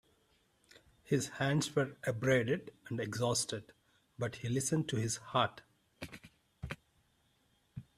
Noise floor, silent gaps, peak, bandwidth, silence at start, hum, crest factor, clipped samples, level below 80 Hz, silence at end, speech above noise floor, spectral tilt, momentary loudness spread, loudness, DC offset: -74 dBFS; none; -16 dBFS; 14.5 kHz; 1.1 s; none; 22 dB; under 0.1%; -66 dBFS; 0.15 s; 39 dB; -4.5 dB/octave; 18 LU; -35 LUFS; under 0.1%